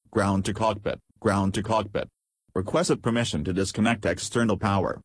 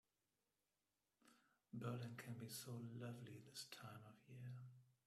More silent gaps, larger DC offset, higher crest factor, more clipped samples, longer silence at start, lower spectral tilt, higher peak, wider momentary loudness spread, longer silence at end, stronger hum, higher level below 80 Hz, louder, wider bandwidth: neither; neither; about the same, 16 dB vs 20 dB; neither; second, 0.1 s vs 1.25 s; about the same, -5.5 dB/octave vs -5 dB/octave; first, -10 dBFS vs -36 dBFS; about the same, 8 LU vs 9 LU; about the same, 0.05 s vs 0.15 s; neither; first, -50 dBFS vs -88 dBFS; first, -26 LUFS vs -55 LUFS; second, 11 kHz vs 15 kHz